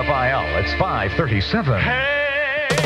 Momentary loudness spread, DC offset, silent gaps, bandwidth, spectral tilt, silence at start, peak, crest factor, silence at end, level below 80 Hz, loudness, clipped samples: 2 LU; under 0.1%; none; 14.5 kHz; -5.5 dB/octave; 0 s; -2 dBFS; 16 dB; 0 s; -34 dBFS; -19 LUFS; under 0.1%